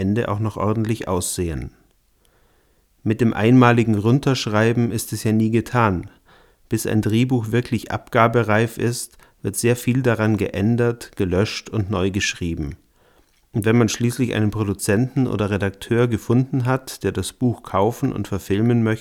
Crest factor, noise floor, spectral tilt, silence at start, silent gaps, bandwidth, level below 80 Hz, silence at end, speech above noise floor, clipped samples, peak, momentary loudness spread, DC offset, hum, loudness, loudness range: 20 dB; -60 dBFS; -6 dB/octave; 0 s; none; 17 kHz; -46 dBFS; 0 s; 40 dB; under 0.1%; 0 dBFS; 8 LU; under 0.1%; none; -20 LUFS; 4 LU